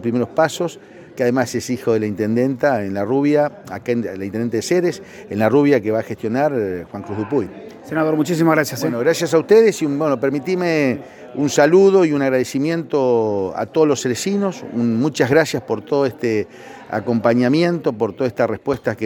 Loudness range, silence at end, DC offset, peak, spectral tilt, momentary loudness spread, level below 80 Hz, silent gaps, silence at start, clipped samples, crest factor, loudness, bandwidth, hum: 3 LU; 0 s; under 0.1%; 0 dBFS; -6 dB/octave; 11 LU; -60 dBFS; none; 0 s; under 0.1%; 16 dB; -18 LUFS; 18 kHz; none